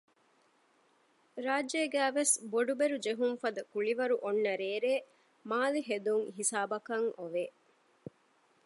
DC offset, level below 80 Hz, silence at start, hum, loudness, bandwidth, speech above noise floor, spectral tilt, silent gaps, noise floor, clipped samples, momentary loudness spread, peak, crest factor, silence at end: under 0.1%; -88 dBFS; 1.35 s; none; -33 LUFS; 12 kHz; 37 dB; -2 dB/octave; none; -70 dBFS; under 0.1%; 12 LU; -16 dBFS; 18 dB; 1.15 s